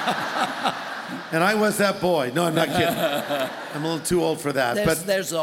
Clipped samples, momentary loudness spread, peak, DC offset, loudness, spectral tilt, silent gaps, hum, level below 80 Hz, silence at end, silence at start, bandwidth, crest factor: under 0.1%; 7 LU; -6 dBFS; under 0.1%; -23 LUFS; -4 dB/octave; none; none; -54 dBFS; 0 s; 0 s; 17 kHz; 16 dB